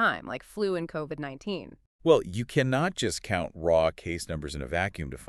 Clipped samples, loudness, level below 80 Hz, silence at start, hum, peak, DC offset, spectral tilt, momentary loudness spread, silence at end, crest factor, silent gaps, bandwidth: under 0.1%; -29 LUFS; -50 dBFS; 0 s; none; -8 dBFS; under 0.1%; -5 dB/octave; 12 LU; 0 s; 20 dB; 1.86-1.99 s; 13.5 kHz